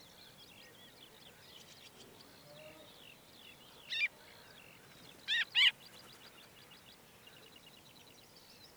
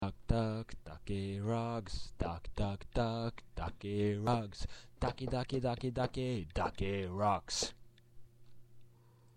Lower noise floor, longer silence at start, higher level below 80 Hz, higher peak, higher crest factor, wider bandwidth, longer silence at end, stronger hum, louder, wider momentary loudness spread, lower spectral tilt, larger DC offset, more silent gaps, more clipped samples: about the same, -60 dBFS vs -63 dBFS; first, 1 s vs 0 s; second, -80 dBFS vs -48 dBFS; about the same, -16 dBFS vs -16 dBFS; about the same, 26 dB vs 22 dB; first, over 20 kHz vs 12 kHz; first, 2.5 s vs 0.1 s; neither; first, -32 LUFS vs -38 LUFS; first, 25 LU vs 10 LU; second, -0.5 dB/octave vs -5.5 dB/octave; neither; neither; neither